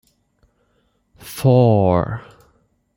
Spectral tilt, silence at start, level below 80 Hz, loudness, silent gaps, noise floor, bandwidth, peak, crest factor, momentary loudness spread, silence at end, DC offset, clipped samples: -8 dB/octave; 1.25 s; -50 dBFS; -16 LUFS; none; -64 dBFS; 16.5 kHz; -2 dBFS; 16 dB; 19 LU; 0.75 s; under 0.1%; under 0.1%